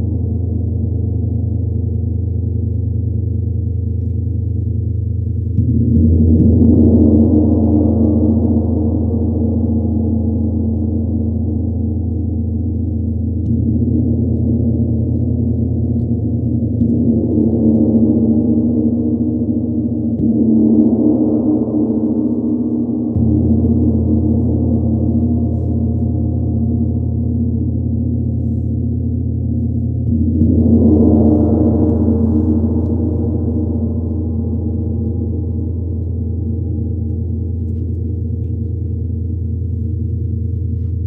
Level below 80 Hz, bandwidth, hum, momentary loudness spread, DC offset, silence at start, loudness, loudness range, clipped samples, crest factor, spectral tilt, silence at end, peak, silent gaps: -26 dBFS; 1.2 kHz; none; 9 LU; under 0.1%; 0 s; -16 LUFS; 7 LU; under 0.1%; 14 dB; -15 dB/octave; 0 s; -2 dBFS; none